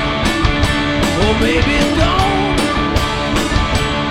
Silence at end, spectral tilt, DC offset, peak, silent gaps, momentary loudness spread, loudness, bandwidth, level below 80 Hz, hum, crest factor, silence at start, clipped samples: 0 s; -5 dB/octave; under 0.1%; 0 dBFS; none; 3 LU; -15 LUFS; 17 kHz; -22 dBFS; none; 14 dB; 0 s; under 0.1%